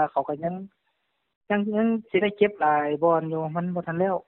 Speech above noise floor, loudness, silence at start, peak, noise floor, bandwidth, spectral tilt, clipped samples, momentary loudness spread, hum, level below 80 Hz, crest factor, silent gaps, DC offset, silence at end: 50 dB; -25 LUFS; 0 s; -6 dBFS; -75 dBFS; 4.1 kHz; -5.5 dB/octave; under 0.1%; 7 LU; none; -66 dBFS; 18 dB; 1.36-1.41 s; under 0.1%; 0.05 s